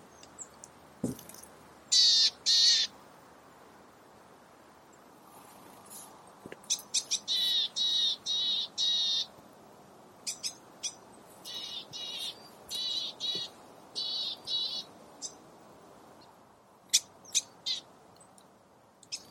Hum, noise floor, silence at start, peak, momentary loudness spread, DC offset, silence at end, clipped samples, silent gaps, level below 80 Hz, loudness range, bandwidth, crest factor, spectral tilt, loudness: none; -61 dBFS; 0.4 s; -10 dBFS; 24 LU; under 0.1%; 0.05 s; under 0.1%; none; -76 dBFS; 11 LU; 16.5 kHz; 24 dB; 0.5 dB/octave; -29 LUFS